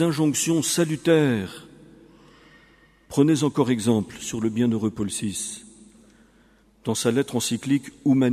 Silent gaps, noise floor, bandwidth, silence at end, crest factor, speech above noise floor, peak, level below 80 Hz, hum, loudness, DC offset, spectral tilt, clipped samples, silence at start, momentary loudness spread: none; -57 dBFS; 15.5 kHz; 0 s; 18 dB; 35 dB; -6 dBFS; -58 dBFS; none; -23 LUFS; under 0.1%; -5 dB/octave; under 0.1%; 0 s; 10 LU